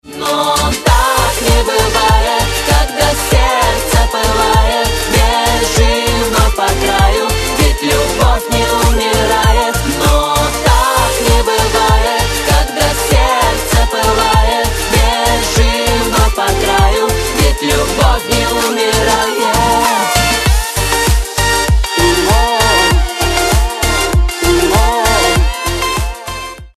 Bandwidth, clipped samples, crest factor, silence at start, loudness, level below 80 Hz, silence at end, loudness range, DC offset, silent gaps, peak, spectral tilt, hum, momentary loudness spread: 14.5 kHz; under 0.1%; 12 dB; 0.05 s; -12 LUFS; -16 dBFS; 0.1 s; 1 LU; under 0.1%; none; 0 dBFS; -3.5 dB/octave; none; 3 LU